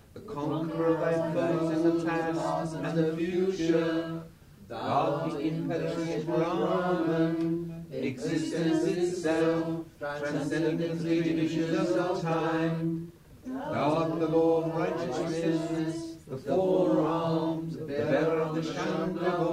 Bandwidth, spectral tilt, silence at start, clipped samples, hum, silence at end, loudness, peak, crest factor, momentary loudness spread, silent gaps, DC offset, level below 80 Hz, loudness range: 12 kHz; -7 dB/octave; 0.15 s; under 0.1%; none; 0 s; -29 LUFS; -14 dBFS; 16 dB; 8 LU; none; under 0.1%; -60 dBFS; 2 LU